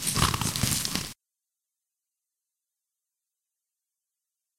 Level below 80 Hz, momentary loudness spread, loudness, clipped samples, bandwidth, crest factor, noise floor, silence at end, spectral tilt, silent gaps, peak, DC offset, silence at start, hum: -48 dBFS; 8 LU; -26 LUFS; under 0.1%; 17 kHz; 28 dB; -87 dBFS; 3.45 s; -2.5 dB/octave; none; -6 dBFS; under 0.1%; 0 s; none